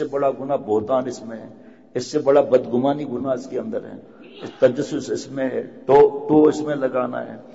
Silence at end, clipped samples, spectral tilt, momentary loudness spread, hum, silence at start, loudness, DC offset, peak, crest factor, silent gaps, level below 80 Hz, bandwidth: 0.05 s; under 0.1%; -6.5 dB/octave; 16 LU; none; 0 s; -20 LUFS; 0.2%; -4 dBFS; 16 dB; none; -60 dBFS; 8 kHz